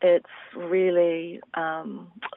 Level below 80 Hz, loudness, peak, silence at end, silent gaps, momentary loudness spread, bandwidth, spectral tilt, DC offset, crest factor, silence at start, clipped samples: -78 dBFS; -25 LUFS; -10 dBFS; 0.05 s; none; 16 LU; 3.9 kHz; -4 dB/octave; under 0.1%; 14 dB; 0 s; under 0.1%